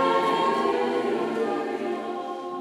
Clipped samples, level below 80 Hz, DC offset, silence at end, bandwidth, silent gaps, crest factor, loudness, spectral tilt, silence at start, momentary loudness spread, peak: under 0.1%; -86 dBFS; under 0.1%; 0 s; 15.5 kHz; none; 16 dB; -26 LUFS; -5 dB/octave; 0 s; 9 LU; -10 dBFS